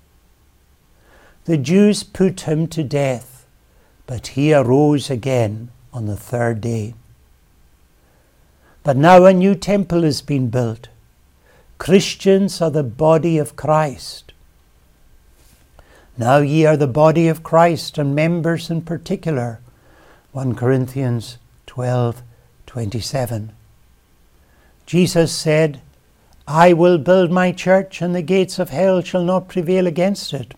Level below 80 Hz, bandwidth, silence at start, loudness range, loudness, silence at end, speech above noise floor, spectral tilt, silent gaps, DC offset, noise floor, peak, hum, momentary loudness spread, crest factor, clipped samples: -48 dBFS; 16.5 kHz; 1.45 s; 8 LU; -17 LUFS; 0.05 s; 38 dB; -6.5 dB/octave; none; under 0.1%; -54 dBFS; 0 dBFS; none; 14 LU; 18 dB; under 0.1%